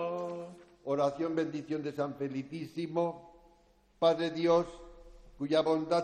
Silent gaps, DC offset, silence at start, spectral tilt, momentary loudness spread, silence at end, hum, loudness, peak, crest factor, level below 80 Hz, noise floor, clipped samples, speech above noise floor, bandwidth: none; under 0.1%; 0 s; -6.5 dB/octave; 14 LU; 0 s; none; -33 LUFS; -14 dBFS; 18 dB; -62 dBFS; -65 dBFS; under 0.1%; 34 dB; 9.4 kHz